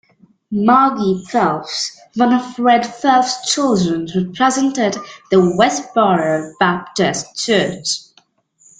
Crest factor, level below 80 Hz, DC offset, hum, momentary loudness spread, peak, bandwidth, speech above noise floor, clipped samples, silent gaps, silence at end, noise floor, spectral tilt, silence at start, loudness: 16 dB; -56 dBFS; under 0.1%; none; 8 LU; 0 dBFS; 9.6 kHz; 40 dB; under 0.1%; none; 0.8 s; -56 dBFS; -4.5 dB/octave; 0.5 s; -16 LUFS